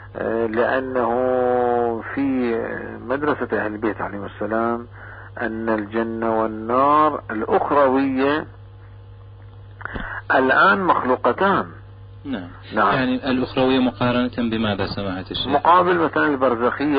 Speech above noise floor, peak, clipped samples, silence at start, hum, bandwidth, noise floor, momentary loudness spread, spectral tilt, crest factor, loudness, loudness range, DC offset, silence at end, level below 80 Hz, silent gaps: 21 dB; -4 dBFS; under 0.1%; 0 s; none; 5.2 kHz; -41 dBFS; 14 LU; -10.5 dB/octave; 16 dB; -20 LUFS; 5 LU; under 0.1%; 0 s; -46 dBFS; none